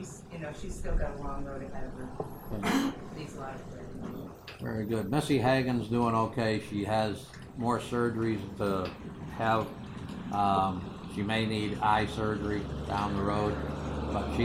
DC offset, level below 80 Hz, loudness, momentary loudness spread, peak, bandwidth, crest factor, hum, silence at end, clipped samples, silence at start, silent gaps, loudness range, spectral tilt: under 0.1%; -44 dBFS; -32 LUFS; 14 LU; -14 dBFS; 16 kHz; 18 dB; none; 0 s; under 0.1%; 0 s; none; 6 LU; -6.5 dB/octave